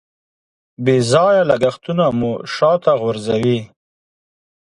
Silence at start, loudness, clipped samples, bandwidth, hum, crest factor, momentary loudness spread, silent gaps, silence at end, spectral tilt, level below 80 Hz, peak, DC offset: 0.8 s; -16 LUFS; under 0.1%; 11.5 kHz; none; 16 dB; 8 LU; none; 1 s; -6 dB/octave; -54 dBFS; 0 dBFS; under 0.1%